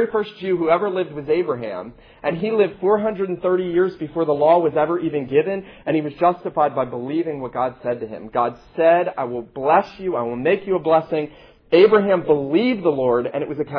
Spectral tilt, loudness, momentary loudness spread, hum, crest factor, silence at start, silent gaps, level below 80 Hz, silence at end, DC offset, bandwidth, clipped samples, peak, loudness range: -9 dB/octave; -20 LUFS; 10 LU; none; 18 dB; 0 s; none; -56 dBFS; 0 s; under 0.1%; 5.4 kHz; under 0.1%; -2 dBFS; 4 LU